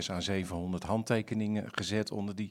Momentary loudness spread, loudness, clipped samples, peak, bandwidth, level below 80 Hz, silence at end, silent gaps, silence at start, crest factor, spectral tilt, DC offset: 5 LU; -34 LUFS; under 0.1%; -14 dBFS; 15.5 kHz; -62 dBFS; 0 s; none; 0 s; 20 dB; -5.5 dB/octave; under 0.1%